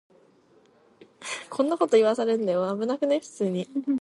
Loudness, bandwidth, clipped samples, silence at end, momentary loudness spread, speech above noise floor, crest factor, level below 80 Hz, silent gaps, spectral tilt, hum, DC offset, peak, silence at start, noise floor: -25 LUFS; 11.5 kHz; under 0.1%; 0.05 s; 13 LU; 35 dB; 18 dB; -80 dBFS; none; -5.5 dB/octave; none; under 0.1%; -8 dBFS; 1.2 s; -59 dBFS